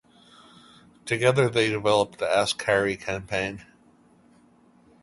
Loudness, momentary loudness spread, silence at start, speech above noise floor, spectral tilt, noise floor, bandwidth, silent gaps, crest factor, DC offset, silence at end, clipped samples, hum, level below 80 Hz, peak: -24 LUFS; 10 LU; 1.05 s; 34 dB; -4.5 dB/octave; -58 dBFS; 11.5 kHz; none; 20 dB; under 0.1%; 1.4 s; under 0.1%; none; -56 dBFS; -6 dBFS